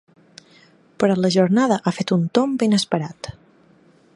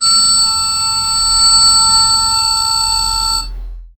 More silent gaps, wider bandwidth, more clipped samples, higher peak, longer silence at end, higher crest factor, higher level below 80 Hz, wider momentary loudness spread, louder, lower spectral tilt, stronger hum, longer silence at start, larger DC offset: neither; second, 11.5 kHz vs 16.5 kHz; neither; about the same, -2 dBFS vs 0 dBFS; first, 0.85 s vs 0.1 s; first, 20 dB vs 12 dB; second, -58 dBFS vs -30 dBFS; first, 12 LU vs 7 LU; second, -19 LUFS vs -9 LUFS; first, -6 dB/octave vs 1.5 dB/octave; neither; first, 1 s vs 0 s; second, under 0.1% vs 0.5%